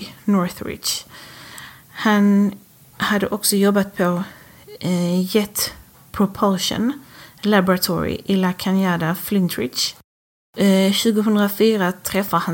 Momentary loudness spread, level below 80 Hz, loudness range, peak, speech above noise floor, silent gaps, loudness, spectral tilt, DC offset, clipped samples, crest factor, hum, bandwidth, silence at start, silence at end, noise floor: 12 LU; -52 dBFS; 2 LU; -4 dBFS; 21 dB; 10.04-10.53 s; -19 LUFS; -5 dB/octave; under 0.1%; under 0.1%; 16 dB; none; 17 kHz; 0 s; 0 s; -40 dBFS